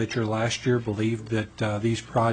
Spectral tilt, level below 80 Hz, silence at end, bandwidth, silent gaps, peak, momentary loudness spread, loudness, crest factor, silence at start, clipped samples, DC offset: -6 dB/octave; -54 dBFS; 0 s; 9.4 kHz; none; -10 dBFS; 4 LU; -26 LUFS; 14 dB; 0 s; under 0.1%; under 0.1%